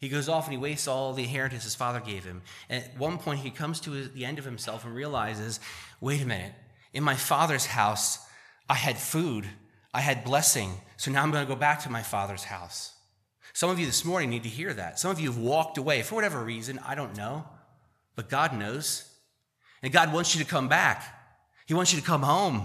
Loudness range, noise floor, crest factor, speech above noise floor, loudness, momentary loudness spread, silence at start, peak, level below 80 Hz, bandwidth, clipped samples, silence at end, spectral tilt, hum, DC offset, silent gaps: 7 LU; -69 dBFS; 28 dB; 41 dB; -28 LUFS; 13 LU; 0 s; -2 dBFS; -66 dBFS; 15 kHz; under 0.1%; 0 s; -3.5 dB/octave; none; under 0.1%; none